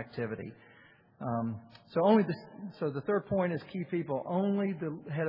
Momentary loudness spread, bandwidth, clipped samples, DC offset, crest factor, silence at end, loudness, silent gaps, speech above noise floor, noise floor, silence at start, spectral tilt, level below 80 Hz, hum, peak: 15 LU; 5.6 kHz; under 0.1%; under 0.1%; 20 dB; 0 s; -32 LUFS; none; 27 dB; -59 dBFS; 0 s; -7 dB/octave; -70 dBFS; none; -12 dBFS